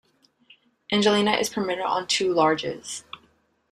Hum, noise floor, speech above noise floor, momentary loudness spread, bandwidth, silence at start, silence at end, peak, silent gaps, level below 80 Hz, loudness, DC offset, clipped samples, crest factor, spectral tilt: none; -63 dBFS; 40 dB; 15 LU; 14.5 kHz; 0.9 s; 0.55 s; -4 dBFS; none; -64 dBFS; -23 LUFS; under 0.1%; under 0.1%; 20 dB; -3.5 dB/octave